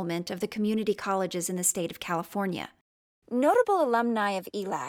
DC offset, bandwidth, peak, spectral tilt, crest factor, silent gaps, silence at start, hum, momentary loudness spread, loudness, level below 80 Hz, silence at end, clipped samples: under 0.1%; over 20 kHz; -12 dBFS; -4 dB/octave; 16 dB; 2.81-3.22 s; 0 s; none; 10 LU; -28 LUFS; -70 dBFS; 0 s; under 0.1%